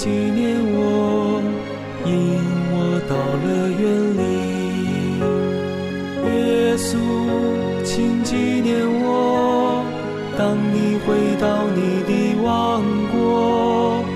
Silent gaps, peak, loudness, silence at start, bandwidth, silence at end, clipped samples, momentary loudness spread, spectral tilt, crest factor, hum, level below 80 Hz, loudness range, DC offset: none; -8 dBFS; -19 LUFS; 0 s; 14 kHz; 0 s; under 0.1%; 5 LU; -6.5 dB/octave; 10 dB; none; -48 dBFS; 2 LU; under 0.1%